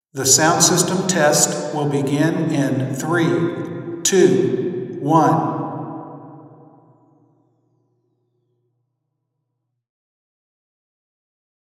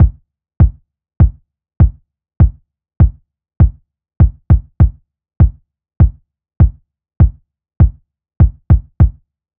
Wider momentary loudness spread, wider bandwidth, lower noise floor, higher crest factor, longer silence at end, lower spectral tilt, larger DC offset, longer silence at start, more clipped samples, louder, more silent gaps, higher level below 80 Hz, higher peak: first, 15 LU vs 2 LU; first, 16.5 kHz vs 2.6 kHz; first, -76 dBFS vs -29 dBFS; first, 20 dB vs 14 dB; first, 5.2 s vs 0.5 s; second, -4 dB/octave vs -13.5 dB/octave; neither; first, 0.15 s vs 0 s; neither; second, -17 LUFS vs -14 LUFS; neither; second, -70 dBFS vs -16 dBFS; about the same, 0 dBFS vs 0 dBFS